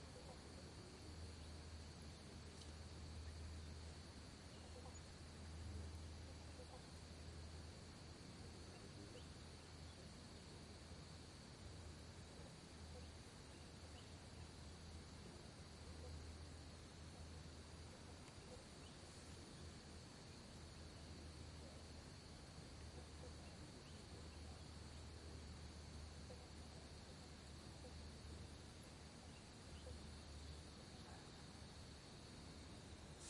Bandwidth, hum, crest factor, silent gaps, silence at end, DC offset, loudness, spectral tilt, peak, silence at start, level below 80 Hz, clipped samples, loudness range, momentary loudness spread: 11.5 kHz; none; 14 dB; none; 0 s; under 0.1%; -58 LUFS; -4.5 dB/octave; -42 dBFS; 0 s; -64 dBFS; under 0.1%; 2 LU; 3 LU